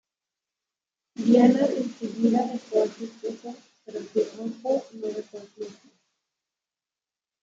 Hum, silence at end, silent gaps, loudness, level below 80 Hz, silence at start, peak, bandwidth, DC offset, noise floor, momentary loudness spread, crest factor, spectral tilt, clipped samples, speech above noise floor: none; 1.7 s; none; -25 LUFS; -78 dBFS; 1.2 s; -6 dBFS; 7.6 kHz; under 0.1%; under -90 dBFS; 21 LU; 20 dB; -6.5 dB/octave; under 0.1%; over 65 dB